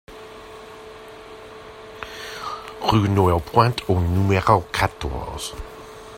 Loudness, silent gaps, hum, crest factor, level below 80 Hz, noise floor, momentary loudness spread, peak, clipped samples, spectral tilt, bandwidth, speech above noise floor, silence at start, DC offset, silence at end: -21 LUFS; none; none; 22 dB; -42 dBFS; -40 dBFS; 22 LU; 0 dBFS; under 0.1%; -6 dB/octave; 16 kHz; 20 dB; 0.1 s; under 0.1%; 0 s